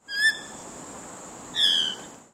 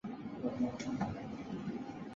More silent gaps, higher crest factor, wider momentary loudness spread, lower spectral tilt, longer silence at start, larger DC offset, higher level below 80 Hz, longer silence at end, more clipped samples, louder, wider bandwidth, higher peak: neither; about the same, 18 dB vs 16 dB; first, 20 LU vs 7 LU; second, 0.5 dB/octave vs -6.5 dB/octave; about the same, 0.1 s vs 0.05 s; neither; about the same, -64 dBFS vs -64 dBFS; first, 0.15 s vs 0 s; neither; first, -22 LUFS vs -40 LUFS; first, 16 kHz vs 7.6 kHz; first, -10 dBFS vs -24 dBFS